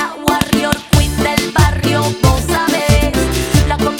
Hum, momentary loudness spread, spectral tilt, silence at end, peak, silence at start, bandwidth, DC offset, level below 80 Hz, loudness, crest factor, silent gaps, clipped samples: none; 2 LU; -5 dB/octave; 0 s; 0 dBFS; 0 s; over 20 kHz; under 0.1%; -22 dBFS; -14 LUFS; 14 dB; none; under 0.1%